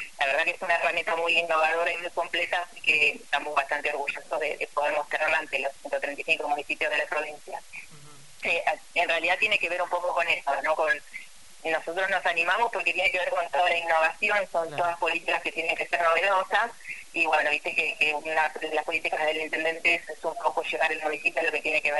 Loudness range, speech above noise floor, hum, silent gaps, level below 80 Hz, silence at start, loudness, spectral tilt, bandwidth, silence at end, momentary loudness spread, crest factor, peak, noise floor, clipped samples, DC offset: 3 LU; 23 dB; none; none; -66 dBFS; 0 s; -26 LUFS; -1.5 dB/octave; 11.5 kHz; 0 s; 7 LU; 18 dB; -8 dBFS; -50 dBFS; under 0.1%; 0.4%